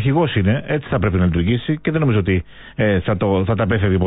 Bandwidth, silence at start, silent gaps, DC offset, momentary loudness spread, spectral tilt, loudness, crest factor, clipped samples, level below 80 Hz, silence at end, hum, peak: 4 kHz; 0 s; none; under 0.1%; 4 LU; -12.5 dB/octave; -18 LUFS; 10 dB; under 0.1%; -32 dBFS; 0 s; none; -6 dBFS